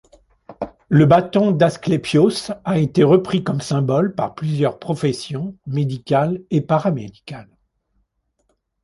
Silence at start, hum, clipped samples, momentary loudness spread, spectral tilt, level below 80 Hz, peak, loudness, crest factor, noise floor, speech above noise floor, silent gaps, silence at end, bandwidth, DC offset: 0.5 s; none; under 0.1%; 14 LU; -7 dB/octave; -52 dBFS; -2 dBFS; -18 LUFS; 18 dB; -68 dBFS; 50 dB; none; 1.4 s; 11.5 kHz; under 0.1%